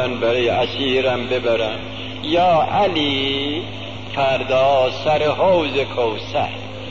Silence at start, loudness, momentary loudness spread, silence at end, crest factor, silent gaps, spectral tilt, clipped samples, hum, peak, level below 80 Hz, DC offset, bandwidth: 0 s; -18 LUFS; 11 LU; 0 s; 12 dB; none; -5.5 dB/octave; under 0.1%; none; -8 dBFS; -46 dBFS; 1%; 7.6 kHz